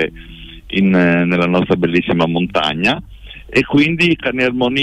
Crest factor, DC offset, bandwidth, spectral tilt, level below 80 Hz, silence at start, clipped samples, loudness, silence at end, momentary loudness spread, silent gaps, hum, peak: 12 dB; under 0.1%; 10 kHz; -6.5 dB/octave; -40 dBFS; 0 s; under 0.1%; -15 LUFS; 0 s; 9 LU; none; none; -4 dBFS